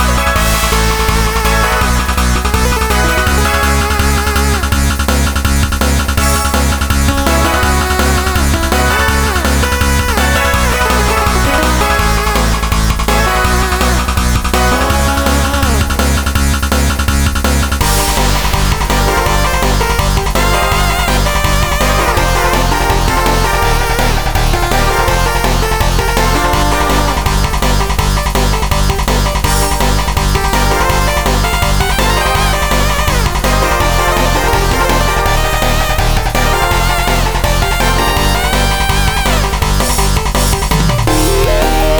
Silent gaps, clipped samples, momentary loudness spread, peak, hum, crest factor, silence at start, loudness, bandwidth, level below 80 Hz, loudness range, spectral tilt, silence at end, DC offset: none; under 0.1%; 2 LU; 0 dBFS; none; 12 dB; 0 s; -12 LUFS; over 20 kHz; -14 dBFS; 1 LU; -4 dB/octave; 0 s; under 0.1%